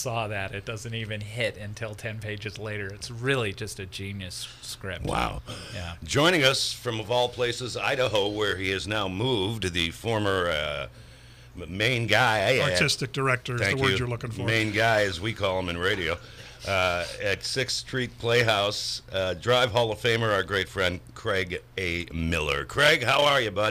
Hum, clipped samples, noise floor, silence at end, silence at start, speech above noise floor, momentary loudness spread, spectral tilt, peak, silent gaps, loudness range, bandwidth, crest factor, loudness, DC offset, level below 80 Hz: none; under 0.1%; -49 dBFS; 0 s; 0 s; 22 dB; 13 LU; -4 dB/octave; -6 dBFS; none; 7 LU; 15.5 kHz; 22 dB; -26 LUFS; under 0.1%; -48 dBFS